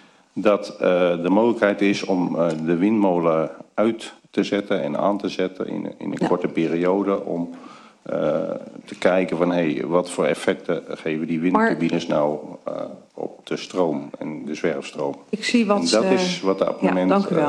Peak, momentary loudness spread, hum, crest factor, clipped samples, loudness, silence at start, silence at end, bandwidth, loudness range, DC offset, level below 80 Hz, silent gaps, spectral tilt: -4 dBFS; 12 LU; none; 18 dB; under 0.1%; -22 LUFS; 0.35 s; 0 s; 11.5 kHz; 4 LU; under 0.1%; -64 dBFS; none; -5.5 dB/octave